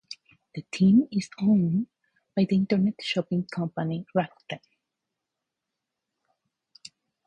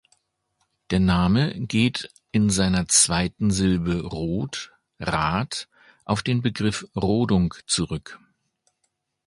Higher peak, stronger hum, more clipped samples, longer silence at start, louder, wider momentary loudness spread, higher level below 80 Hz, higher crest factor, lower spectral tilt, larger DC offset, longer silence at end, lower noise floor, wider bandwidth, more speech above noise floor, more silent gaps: second, -10 dBFS vs -4 dBFS; neither; neither; second, 0.1 s vs 0.9 s; second, -26 LUFS vs -23 LUFS; first, 19 LU vs 13 LU; second, -64 dBFS vs -42 dBFS; about the same, 18 dB vs 20 dB; first, -7 dB/octave vs -4.5 dB/octave; neither; first, 2.7 s vs 1.1 s; first, -85 dBFS vs -75 dBFS; second, 9.2 kHz vs 11.5 kHz; first, 61 dB vs 52 dB; neither